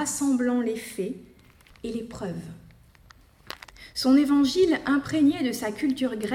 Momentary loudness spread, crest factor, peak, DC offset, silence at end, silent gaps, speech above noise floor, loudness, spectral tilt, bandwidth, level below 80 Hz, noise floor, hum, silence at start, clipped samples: 20 LU; 16 dB; -10 dBFS; under 0.1%; 0 s; none; 30 dB; -25 LUFS; -4.5 dB/octave; 16 kHz; -56 dBFS; -54 dBFS; none; 0 s; under 0.1%